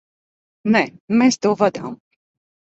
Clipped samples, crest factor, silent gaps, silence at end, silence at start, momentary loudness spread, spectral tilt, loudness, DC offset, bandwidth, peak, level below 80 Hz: under 0.1%; 18 dB; 1.00-1.08 s; 0.75 s; 0.65 s; 13 LU; -5 dB/octave; -18 LUFS; under 0.1%; 8 kHz; -2 dBFS; -64 dBFS